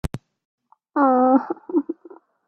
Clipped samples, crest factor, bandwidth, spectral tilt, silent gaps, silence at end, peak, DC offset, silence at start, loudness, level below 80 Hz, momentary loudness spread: under 0.1%; 18 dB; 11.5 kHz; -8.5 dB/octave; 0.45-0.58 s; 0.55 s; -6 dBFS; under 0.1%; 0.05 s; -20 LUFS; -46 dBFS; 19 LU